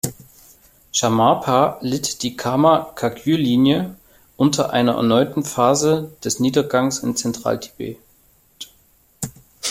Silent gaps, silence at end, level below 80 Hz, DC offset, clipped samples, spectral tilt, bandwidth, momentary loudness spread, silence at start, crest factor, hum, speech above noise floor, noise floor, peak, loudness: none; 0 s; -54 dBFS; under 0.1%; under 0.1%; -4.5 dB/octave; 16.5 kHz; 16 LU; 0.05 s; 18 dB; none; 38 dB; -56 dBFS; -2 dBFS; -19 LUFS